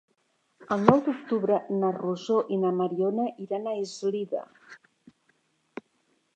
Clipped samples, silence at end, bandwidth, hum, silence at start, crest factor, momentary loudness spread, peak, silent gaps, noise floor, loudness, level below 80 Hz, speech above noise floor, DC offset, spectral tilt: under 0.1%; 1.6 s; 8.8 kHz; none; 0.6 s; 28 dB; 19 LU; 0 dBFS; none; -72 dBFS; -27 LUFS; -70 dBFS; 45 dB; under 0.1%; -7 dB/octave